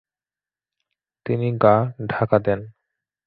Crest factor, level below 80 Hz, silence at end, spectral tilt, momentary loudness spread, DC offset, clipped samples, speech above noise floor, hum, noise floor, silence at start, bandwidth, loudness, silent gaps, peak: 20 dB; -54 dBFS; 0.55 s; -11.5 dB/octave; 10 LU; under 0.1%; under 0.1%; over 70 dB; none; under -90 dBFS; 1.25 s; 4.9 kHz; -21 LUFS; none; -2 dBFS